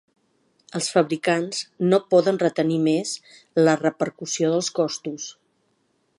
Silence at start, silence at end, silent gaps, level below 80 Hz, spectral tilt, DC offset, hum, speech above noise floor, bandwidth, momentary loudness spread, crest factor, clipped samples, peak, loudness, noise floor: 0.75 s; 0.9 s; none; -74 dBFS; -4.5 dB/octave; under 0.1%; none; 46 dB; 11.5 kHz; 12 LU; 18 dB; under 0.1%; -6 dBFS; -22 LUFS; -68 dBFS